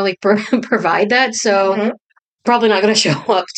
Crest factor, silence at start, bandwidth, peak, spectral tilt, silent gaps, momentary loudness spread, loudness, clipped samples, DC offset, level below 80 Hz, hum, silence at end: 14 dB; 0 s; 9.2 kHz; -2 dBFS; -3.5 dB/octave; 2.04-2.09 s, 2.21-2.39 s; 7 LU; -15 LUFS; under 0.1%; under 0.1%; -66 dBFS; none; 0 s